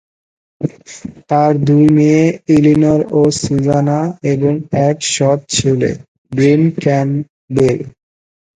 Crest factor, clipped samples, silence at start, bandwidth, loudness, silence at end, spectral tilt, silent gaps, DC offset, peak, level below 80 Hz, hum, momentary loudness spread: 14 dB; under 0.1%; 0.6 s; 9.6 kHz; -13 LUFS; 0.65 s; -6 dB/octave; 6.08-6.25 s, 7.30-7.48 s; under 0.1%; 0 dBFS; -44 dBFS; none; 14 LU